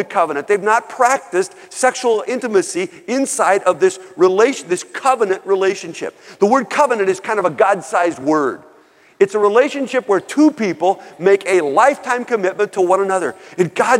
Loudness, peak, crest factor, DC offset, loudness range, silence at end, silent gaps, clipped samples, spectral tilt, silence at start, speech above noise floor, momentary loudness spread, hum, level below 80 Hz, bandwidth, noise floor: -16 LUFS; 0 dBFS; 16 dB; under 0.1%; 2 LU; 0 s; none; under 0.1%; -4 dB/octave; 0 s; 33 dB; 7 LU; none; -70 dBFS; 14 kHz; -49 dBFS